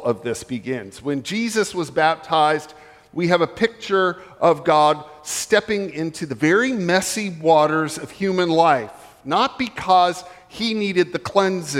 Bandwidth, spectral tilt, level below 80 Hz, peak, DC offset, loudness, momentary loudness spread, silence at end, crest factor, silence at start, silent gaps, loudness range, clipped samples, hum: 16 kHz; -4.5 dB/octave; -58 dBFS; -2 dBFS; under 0.1%; -20 LUFS; 11 LU; 0 s; 18 dB; 0 s; none; 2 LU; under 0.1%; none